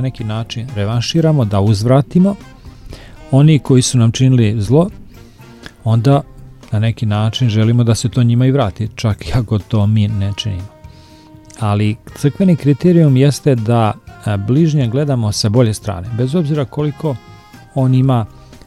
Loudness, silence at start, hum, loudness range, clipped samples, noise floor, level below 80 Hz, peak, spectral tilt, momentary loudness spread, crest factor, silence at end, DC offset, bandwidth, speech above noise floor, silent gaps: -14 LUFS; 0 s; none; 4 LU; under 0.1%; -40 dBFS; -40 dBFS; 0 dBFS; -7 dB/octave; 11 LU; 14 dB; 0.4 s; under 0.1%; 12.5 kHz; 27 dB; none